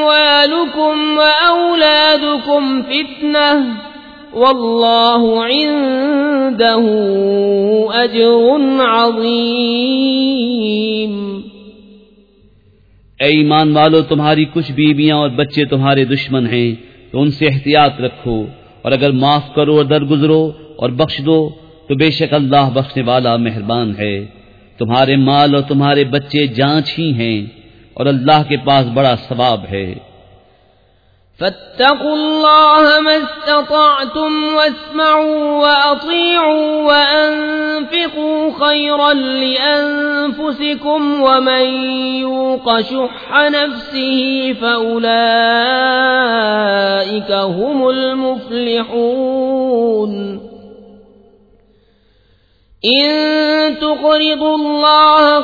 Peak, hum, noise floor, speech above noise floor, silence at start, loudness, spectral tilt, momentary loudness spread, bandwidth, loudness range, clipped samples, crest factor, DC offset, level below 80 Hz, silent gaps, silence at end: 0 dBFS; none; -53 dBFS; 40 dB; 0 s; -12 LUFS; -7.5 dB/octave; 8 LU; 5 kHz; 5 LU; under 0.1%; 14 dB; under 0.1%; -50 dBFS; none; 0 s